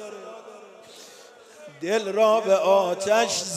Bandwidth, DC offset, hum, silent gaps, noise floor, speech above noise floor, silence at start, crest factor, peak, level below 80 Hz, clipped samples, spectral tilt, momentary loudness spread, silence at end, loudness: 15.5 kHz; under 0.1%; none; none; -48 dBFS; 27 dB; 0 s; 18 dB; -6 dBFS; -80 dBFS; under 0.1%; -2.5 dB/octave; 23 LU; 0 s; -21 LUFS